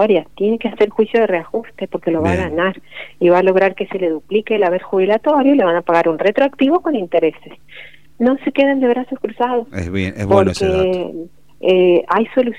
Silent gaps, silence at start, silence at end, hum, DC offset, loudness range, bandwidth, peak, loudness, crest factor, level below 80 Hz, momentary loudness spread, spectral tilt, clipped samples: none; 0 s; 0 s; none; 0.8%; 3 LU; 10.5 kHz; 0 dBFS; -16 LUFS; 16 dB; -48 dBFS; 9 LU; -7 dB/octave; under 0.1%